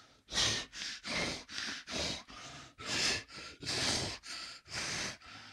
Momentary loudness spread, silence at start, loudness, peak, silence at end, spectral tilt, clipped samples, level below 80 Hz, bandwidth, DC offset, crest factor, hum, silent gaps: 13 LU; 0 s; -36 LUFS; -18 dBFS; 0 s; -1.5 dB/octave; under 0.1%; -60 dBFS; 16 kHz; under 0.1%; 22 dB; none; none